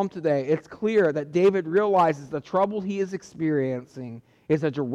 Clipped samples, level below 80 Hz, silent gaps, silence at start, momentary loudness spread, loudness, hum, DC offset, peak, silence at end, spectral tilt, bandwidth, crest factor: under 0.1%; -66 dBFS; none; 0 s; 12 LU; -24 LUFS; none; under 0.1%; -12 dBFS; 0 s; -7.5 dB/octave; 8.6 kHz; 12 dB